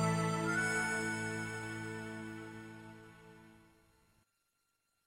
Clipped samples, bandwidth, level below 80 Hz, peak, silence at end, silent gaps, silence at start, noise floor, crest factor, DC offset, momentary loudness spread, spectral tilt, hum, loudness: under 0.1%; 16 kHz; -68 dBFS; -22 dBFS; 1.5 s; none; 0 s; -82 dBFS; 18 dB; under 0.1%; 22 LU; -4.5 dB/octave; none; -37 LUFS